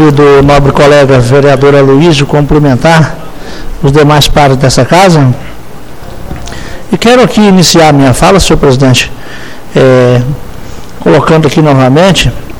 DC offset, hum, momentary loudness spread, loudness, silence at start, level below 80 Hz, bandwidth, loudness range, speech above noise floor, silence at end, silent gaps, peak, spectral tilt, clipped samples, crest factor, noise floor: 7%; none; 20 LU; -5 LUFS; 0 s; -20 dBFS; 18 kHz; 2 LU; 22 dB; 0 s; none; 0 dBFS; -5.5 dB/octave; 8%; 6 dB; -25 dBFS